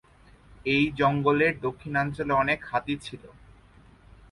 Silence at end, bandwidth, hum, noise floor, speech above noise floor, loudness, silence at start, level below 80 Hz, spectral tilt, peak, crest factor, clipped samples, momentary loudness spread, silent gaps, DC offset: 1.05 s; 11.5 kHz; none; -55 dBFS; 29 dB; -26 LUFS; 0.65 s; -52 dBFS; -6.5 dB/octave; -8 dBFS; 20 dB; under 0.1%; 12 LU; none; under 0.1%